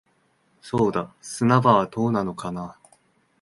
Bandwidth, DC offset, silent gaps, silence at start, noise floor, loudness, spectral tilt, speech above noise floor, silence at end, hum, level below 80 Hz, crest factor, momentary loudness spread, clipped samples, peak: 11.5 kHz; under 0.1%; none; 0.65 s; -65 dBFS; -22 LUFS; -6.5 dB/octave; 43 dB; 0.7 s; none; -58 dBFS; 22 dB; 16 LU; under 0.1%; -2 dBFS